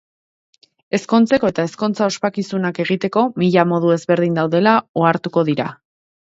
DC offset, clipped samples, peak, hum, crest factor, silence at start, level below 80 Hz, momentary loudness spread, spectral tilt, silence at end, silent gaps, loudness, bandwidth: under 0.1%; under 0.1%; 0 dBFS; none; 18 dB; 0.95 s; -60 dBFS; 7 LU; -6.5 dB/octave; 0.6 s; 4.89-4.94 s; -17 LUFS; 8 kHz